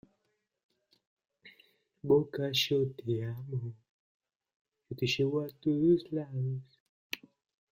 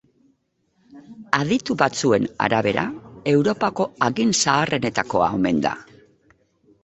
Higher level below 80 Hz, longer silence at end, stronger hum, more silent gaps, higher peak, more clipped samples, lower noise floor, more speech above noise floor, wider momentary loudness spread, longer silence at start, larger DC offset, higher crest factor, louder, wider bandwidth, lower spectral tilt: second, -70 dBFS vs -54 dBFS; second, 0.55 s vs 1 s; neither; first, 3.89-4.20 s, 4.36-4.40 s, 4.56-4.65 s, 6.80-7.10 s vs none; second, -14 dBFS vs 0 dBFS; neither; first, -80 dBFS vs -67 dBFS; about the same, 49 dB vs 47 dB; first, 15 LU vs 6 LU; first, 1.45 s vs 0.95 s; neither; about the same, 20 dB vs 22 dB; second, -32 LUFS vs -21 LUFS; first, 16 kHz vs 8.2 kHz; first, -6 dB/octave vs -4.5 dB/octave